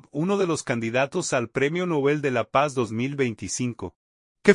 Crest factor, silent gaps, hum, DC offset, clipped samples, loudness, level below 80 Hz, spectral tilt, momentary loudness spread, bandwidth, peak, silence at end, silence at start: 22 dB; 3.96-4.35 s; none; under 0.1%; under 0.1%; -25 LUFS; -62 dBFS; -5 dB/octave; 6 LU; 11 kHz; -2 dBFS; 0 s; 0.15 s